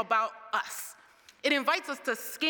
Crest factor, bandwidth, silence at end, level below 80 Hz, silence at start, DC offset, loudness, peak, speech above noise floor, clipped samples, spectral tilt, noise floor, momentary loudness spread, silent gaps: 20 dB; 19.5 kHz; 0 s; -86 dBFS; 0 s; under 0.1%; -30 LUFS; -10 dBFS; 27 dB; under 0.1%; -1 dB/octave; -58 dBFS; 11 LU; none